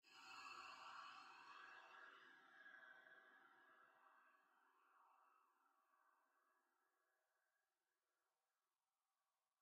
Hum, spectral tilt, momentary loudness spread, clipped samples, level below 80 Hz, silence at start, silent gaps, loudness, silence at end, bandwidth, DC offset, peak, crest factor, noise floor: none; -0.5 dB/octave; 9 LU; under 0.1%; under -90 dBFS; 0.05 s; none; -62 LUFS; 2.15 s; 8.4 kHz; under 0.1%; -48 dBFS; 20 dB; under -90 dBFS